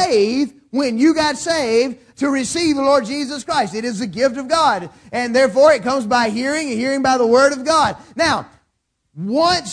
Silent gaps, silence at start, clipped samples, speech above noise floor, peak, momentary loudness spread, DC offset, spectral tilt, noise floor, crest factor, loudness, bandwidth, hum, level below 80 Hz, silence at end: none; 0 s; under 0.1%; 53 dB; 0 dBFS; 10 LU; under 0.1%; -3.5 dB/octave; -70 dBFS; 16 dB; -17 LUFS; 11 kHz; none; -52 dBFS; 0 s